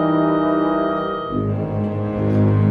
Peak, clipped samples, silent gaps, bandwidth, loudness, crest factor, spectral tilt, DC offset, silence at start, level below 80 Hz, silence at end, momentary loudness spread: -6 dBFS; under 0.1%; none; 4.7 kHz; -20 LUFS; 12 dB; -10.5 dB/octave; under 0.1%; 0 s; -44 dBFS; 0 s; 6 LU